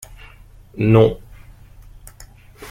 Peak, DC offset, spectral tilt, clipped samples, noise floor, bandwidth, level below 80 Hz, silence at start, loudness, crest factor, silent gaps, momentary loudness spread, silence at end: -2 dBFS; under 0.1%; -8 dB/octave; under 0.1%; -43 dBFS; 15.5 kHz; -42 dBFS; 0.75 s; -16 LUFS; 18 dB; none; 27 LU; 0 s